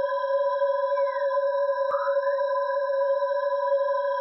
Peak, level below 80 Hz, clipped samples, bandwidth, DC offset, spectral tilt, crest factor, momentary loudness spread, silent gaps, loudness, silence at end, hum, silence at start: -14 dBFS; -88 dBFS; under 0.1%; 5.8 kHz; under 0.1%; -3.5 dB/octave; 10 dB; 1 LU; none; -25 LUFS; 0 s; none; 0 s